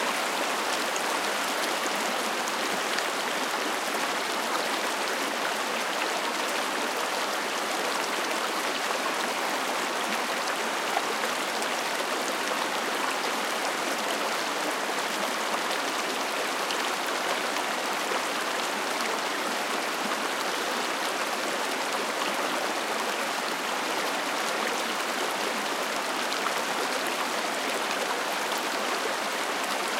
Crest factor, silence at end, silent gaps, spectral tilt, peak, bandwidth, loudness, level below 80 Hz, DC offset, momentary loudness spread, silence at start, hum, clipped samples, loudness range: 20 dB; 0 s; none; -1 dB/octave; -10 dBFS; 17 kHz; -28 LUFS; -84 dBFS; under 0.1%; 1 LU; 0 s; none; under 0.1%; 1 LU